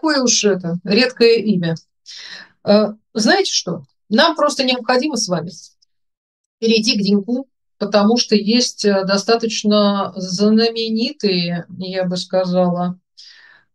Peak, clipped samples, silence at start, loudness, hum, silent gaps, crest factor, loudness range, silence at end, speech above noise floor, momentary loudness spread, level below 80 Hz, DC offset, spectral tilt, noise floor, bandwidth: 0 dBFS; under 0.1%; 0.05 s; -16 LUFS; none; 6.17-6.58 s; 16 dB; 3 LU; 0.55 s; 30 dB; 12 LU; -66 dBFS; under 0.1%; -4 dB/octave; -46 dBFS; 11.5 kHz